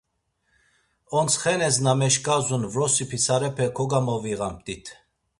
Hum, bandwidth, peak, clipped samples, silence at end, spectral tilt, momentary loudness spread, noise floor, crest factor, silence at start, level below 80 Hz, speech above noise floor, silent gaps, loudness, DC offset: none; 11.5 kHz; -6 dBFS; under 0.1%; 0.45 s; -3.5 dB/octave; 10 LU; -73 dBFS; 18 dB; 1.1 s; -56 dBFS; 49 dB; none; -23 LUFS; under 0.1%